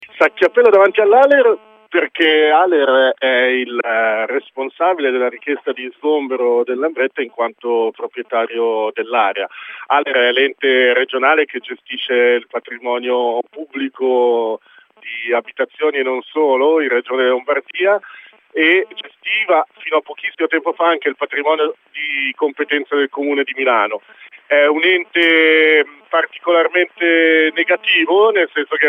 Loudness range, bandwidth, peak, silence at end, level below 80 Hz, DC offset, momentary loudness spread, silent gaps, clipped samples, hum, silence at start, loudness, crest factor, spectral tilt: 6 LU; 5.2 kHz; 0 dBFS; 0 s; -76 dBFS; under 0.1%; 11 LU; none; under 0.1%; none; 0 s; -15 LUFS; 16 dB; -4 dB/octave